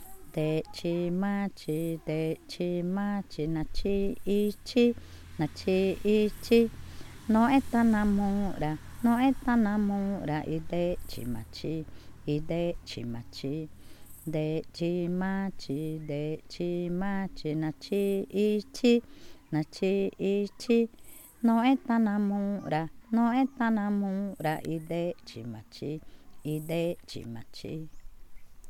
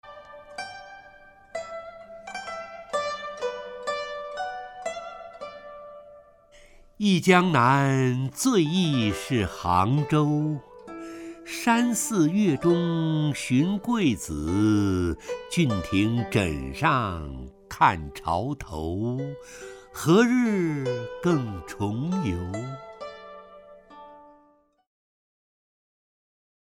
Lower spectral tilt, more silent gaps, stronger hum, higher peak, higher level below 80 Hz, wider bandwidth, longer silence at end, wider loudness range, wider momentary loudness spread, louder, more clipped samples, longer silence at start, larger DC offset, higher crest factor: first, -7 dB/octave vs -5.5 dB/octave; neither; neither; second, -12 dBFS vs -4 dBFS; about the same, -48 dBFS vs -50 dBFS; about the same, 16 kHz vs 17.5 kHz; second, 0 s vs 2.55 s; second, 8 LU vs 12 LU; second, 14 LU vs 19 LU; second, -30 LUFS vs -25 LUFS; neither; about the same, 0 s vs 0.05 s; neither; about the same, 18 dB vs 22 dB